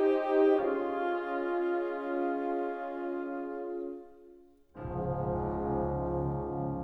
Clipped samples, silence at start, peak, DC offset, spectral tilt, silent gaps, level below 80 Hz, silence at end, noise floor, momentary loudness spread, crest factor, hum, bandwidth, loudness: under 0.1%; 0 s; -16 dBFS; under 0.1%; -10 dB/octave; none; -50 dBFS; 0 s; -57 dBFS; 11 LU; 16 dB; none; 5.4 kHz; -32 LUFS